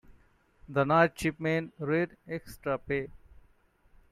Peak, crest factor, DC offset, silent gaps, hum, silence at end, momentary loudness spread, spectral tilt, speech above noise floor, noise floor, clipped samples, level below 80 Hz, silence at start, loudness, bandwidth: -10 dBFS; 22 dB; under 0.1%; none; none; 0.95 s; 14 LU; -6.5 dB/octave; 35 dB; -64 dBFS; under 0.1%; -58 dBFS; 0.1 s; -30 LUFS; 15 kHz